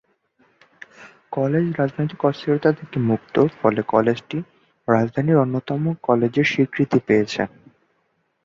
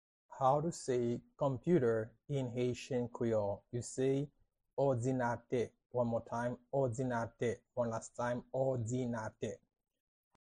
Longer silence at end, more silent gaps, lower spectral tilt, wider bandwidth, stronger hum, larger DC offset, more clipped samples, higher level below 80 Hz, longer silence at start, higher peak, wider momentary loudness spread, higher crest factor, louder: about the same, 0.95 s vs 0.9 s; second, none vs 4.73-4.77 s, 5.86-5.90 s; about the same, -7.5 dB/octave vs -7 dB/octave; second, 7.6 kHz vs 11 kHz; neither; neither; neither; first, -58 dBFS vs -66 dBFS; first, 1 s vs 0.3 s; first, -2 dBFS vs -18 dBFS; about the same, 8 LU vs 8 LU; about the same, 20 dB vs 18 dB; first, -21 LUFS vs -37 LUFS